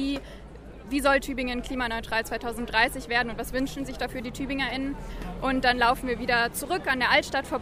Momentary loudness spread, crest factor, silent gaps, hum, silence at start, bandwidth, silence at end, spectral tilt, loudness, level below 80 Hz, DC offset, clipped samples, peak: 12 LU; 20 dB; none; none; 0 s; 15.5 kHz; 0 s; -3.5 dB/octave; -26 LUFS; -42 dBFS; under 0.1%; under 0.1%; -6 dBFS